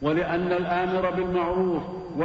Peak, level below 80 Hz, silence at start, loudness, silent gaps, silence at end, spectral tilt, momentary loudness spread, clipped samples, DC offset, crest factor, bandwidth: -12 dBFS; -48 dBFS; 0 s; -25 LUFS; none; 0 s; -8.5 dB/octave; 3 LU; under 0.1%; under 0.1%; 14 dB; 7 kHz